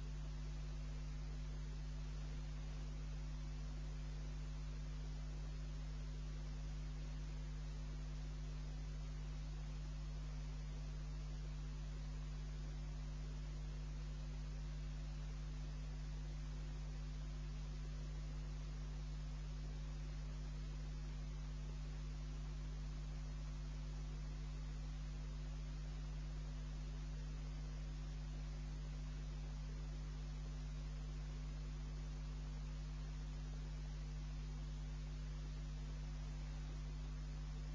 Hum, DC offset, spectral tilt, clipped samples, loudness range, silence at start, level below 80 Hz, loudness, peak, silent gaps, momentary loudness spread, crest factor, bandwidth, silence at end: none; under 0.1%; -6 dB/octave; under 0.1%; 0 LU; 0 s; -48 dBFS; -50 LUFS; -38 dBFS; none; 0 LU; 8 dB; 7.6 kHz; 0 s